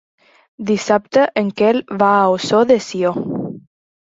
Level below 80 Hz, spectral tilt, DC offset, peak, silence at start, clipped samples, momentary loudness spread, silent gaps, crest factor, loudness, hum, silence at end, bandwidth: -60 dBFS; -5.5 dB/octave; under 0.1%; -2 dBFS; 0.6 s; under 0.1%; 12 LU; none; 16 dB; -16 LUFS; none; 0.55 s; 8 kHz